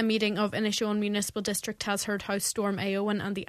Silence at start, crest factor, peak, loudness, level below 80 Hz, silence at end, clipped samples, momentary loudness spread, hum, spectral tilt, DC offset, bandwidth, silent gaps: 0 s; 18 dB; -12 dBFS; -29 LUFS; -62 dBFS; 0.05 s; under 0.1%; 4 LU; none; -3.5 dB/octave; under 0.1%; 14 kHz; none